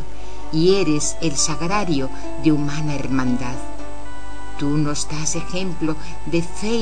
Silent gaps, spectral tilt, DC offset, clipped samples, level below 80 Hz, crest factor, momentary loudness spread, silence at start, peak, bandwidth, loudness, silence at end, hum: none; -4.5 dB/octave; 10%; under 0.1%; -38 dBFS; 18 dB; 17 LU; 0 s; -4 dBFS; 10.5 kHz; -22 LUFS; 0 s; 50 Hz at -40 dBFS